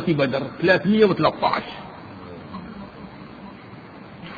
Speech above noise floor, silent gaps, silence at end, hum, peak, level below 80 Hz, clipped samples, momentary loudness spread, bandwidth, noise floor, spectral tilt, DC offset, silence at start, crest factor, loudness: 21 dB; none; 0 s; none; -2 dBFS; -54 dBFS; under 0.1%; 23 LU; 6.8 kHz; -41 dBFS; -8 dB/octave; under 0.1%; 0 s; 20 dB; -20 LUFS